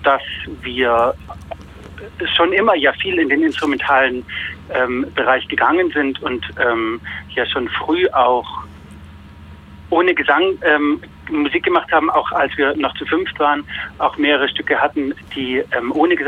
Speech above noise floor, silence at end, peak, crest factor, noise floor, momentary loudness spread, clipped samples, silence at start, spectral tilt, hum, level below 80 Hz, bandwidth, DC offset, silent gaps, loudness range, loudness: 21 dB; 0 s; -2 dBFS; 14 dB; -38 dBFS; 11 LU; under 0.1%; 0 s; -5.5 dB/octave; none; -44 dBFS; 9.4 kHz; under 0.1%; none; 3 LU; -17 LUFS